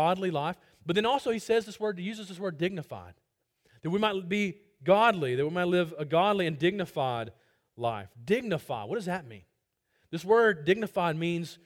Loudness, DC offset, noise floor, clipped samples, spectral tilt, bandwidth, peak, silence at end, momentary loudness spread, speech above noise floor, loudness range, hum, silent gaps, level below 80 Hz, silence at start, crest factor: -29 LUFS; under 0.1%; -77 dBFS; under 0.1%; -6 dB/octave; 16.5 kHz; -10 dBFS; 0.1 s; 13 LU; 48 dB; 6 LU; none; none; -68 dBFS; 0 s; 20 dB